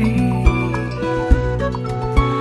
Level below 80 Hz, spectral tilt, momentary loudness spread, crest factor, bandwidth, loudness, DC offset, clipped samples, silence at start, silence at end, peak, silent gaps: -22 dBFS; -8 dB/octave; 5 LU; 16 dB; 11.5 kHz; -19 LUFS; under 0.1%; under 0.1%; 0 s; 0 s; 0 dBFS; none